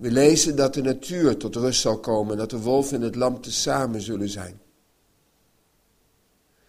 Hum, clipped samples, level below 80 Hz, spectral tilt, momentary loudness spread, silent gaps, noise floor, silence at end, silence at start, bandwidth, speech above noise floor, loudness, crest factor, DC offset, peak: none; under 0.1%; -50 dBFS; -4 dB/octave; 11 LU; none; -65 dBFS; 2.1 s; 0 s; 15.5 kHz; 42 dB; -23 LUFS; 22 dB; under 0.1%; -2 dBFS